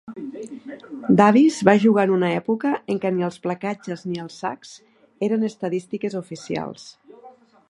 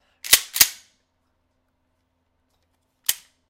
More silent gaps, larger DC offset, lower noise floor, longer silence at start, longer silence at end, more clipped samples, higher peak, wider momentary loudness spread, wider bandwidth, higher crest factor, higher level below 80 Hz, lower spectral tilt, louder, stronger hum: neither; neither; second, -49 dBFS vs -71 dBFS; second, 0.05 s vs 0.25 s; about the same, 0.4 s vs 0.35 s; neither; about the same, 0 dBFS vs 0 dBFS; first, 19 LU vs 10 LU; second, 11.5 kHz vs 17 kHz; about the same, 22 dB vs 26 dB; second, -66 dBFS vs -58 dBFS; first, -6.5 dB/octave vs 2.5 dB/octave; second, -21 LUFS vs -18 LUFS; neither